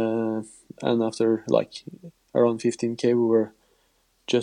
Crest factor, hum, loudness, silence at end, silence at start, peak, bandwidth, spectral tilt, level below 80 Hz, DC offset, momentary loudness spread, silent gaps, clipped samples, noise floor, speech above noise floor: 18 dB; none; -24 LUFS; 0 s; 0 s; -6 dBFS; 11 kHz; -6 dB/octave; -72 dBFS; under 0.1%; 17 LU; none; under 0.1%; -66 dBFS; 43 dB